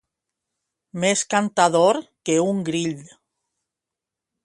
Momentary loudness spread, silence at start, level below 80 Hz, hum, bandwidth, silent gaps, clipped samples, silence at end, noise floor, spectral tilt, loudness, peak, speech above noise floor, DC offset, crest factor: 11 LU; 0.95 s; -68 dBFS; none; 11.5 kHz; none; under 0.1%; 1.4 s; -86 dBFS; -4 dB/octave; -21 LUFS; -2 dBFS; 66 dB; under 0.1%; 20 dB